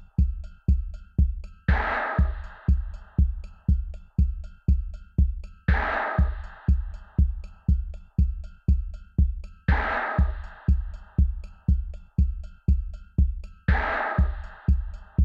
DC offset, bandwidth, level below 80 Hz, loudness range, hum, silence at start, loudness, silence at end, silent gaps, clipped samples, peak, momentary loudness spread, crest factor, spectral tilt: under 0.1%; 4.8 kHz; -26 dBFS; 1 LU; none; 0 s; -27 LUFS; 0 s; none; under 0.1%; -8 dBFS; 7 LU; 16 dB; -9 dB/octave